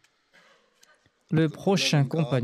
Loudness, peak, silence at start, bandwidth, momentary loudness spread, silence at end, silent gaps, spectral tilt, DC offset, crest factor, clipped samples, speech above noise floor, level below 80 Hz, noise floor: -24 LUFS; -12 dBFS; 1.3 s; 13.5 kHz; 3 LU; 0 s; none; -5.5 dB/octave; under 0.1%; 16 dB; under 0.1%; 38 dB; -70 dBFS; -62 dBFS